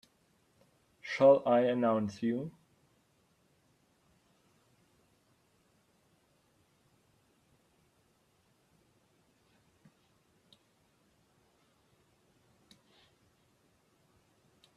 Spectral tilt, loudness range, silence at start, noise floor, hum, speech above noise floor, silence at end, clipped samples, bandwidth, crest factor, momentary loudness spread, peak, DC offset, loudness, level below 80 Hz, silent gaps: -7 dB/octave; 13 LU; 1.05 s; -72 dBFS; none; 44 dB; 12.25 s; under 0.1%; 9 kHz; 26 dB; 18 LU; -12 dBFS; under 0.1%; -29 LUFS; -80 dBFS; none